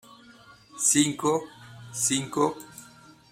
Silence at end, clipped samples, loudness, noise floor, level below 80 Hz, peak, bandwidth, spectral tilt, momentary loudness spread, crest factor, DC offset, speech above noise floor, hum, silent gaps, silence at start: 0.5 s; under 0.1%; -25 LUFS; -52 dBFS; -66 dBFS; -8 dBFS; 16 kHz; -3 dB/octave; 25 LU; 20 dB; under 0.1%; 27 dB; none; none; 0.1 s